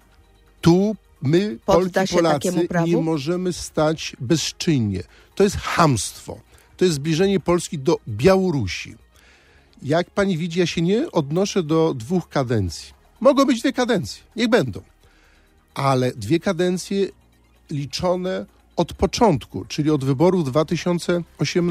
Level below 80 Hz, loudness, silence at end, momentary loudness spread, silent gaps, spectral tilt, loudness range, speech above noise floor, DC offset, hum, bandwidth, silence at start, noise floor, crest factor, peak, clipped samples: -46 dBFS; -21 LUFS; 0 s; 10 LU; none; -5.5 dB/octave; 3 LU; 35 dB; under 0.1%; none; 15 kHz; 0.65 s; -55 dBFS; 20 dB; -2 dBFS; under 0.1%